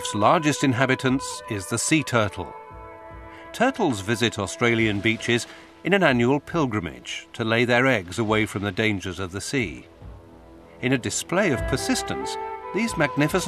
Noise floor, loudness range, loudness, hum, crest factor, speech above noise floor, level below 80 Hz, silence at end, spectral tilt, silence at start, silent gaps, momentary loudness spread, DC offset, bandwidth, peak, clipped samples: -46 dBFS; 4 LU; -23 LUFS; none; 22 dB; 23 dB; -48 dBFS; 0 s; -4.5 dB/octave; 0 s; none; 14 LU; under 0.1%; 14 kHz; -2 dBFS; under 0.1%